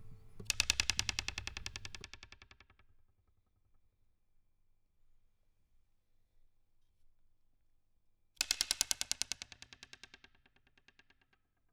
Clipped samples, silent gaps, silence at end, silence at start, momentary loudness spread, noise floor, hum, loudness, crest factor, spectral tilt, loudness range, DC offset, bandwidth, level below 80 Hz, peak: under 0.1%; none; 1.55 s; 0 s; 23 LU; -76 dBFS; none; -36 LUFS; 40 dB; 0.5 dB/octave; 13 LU; under 0.1%; over 20 kHz; -60 dBFS; -4 dBFS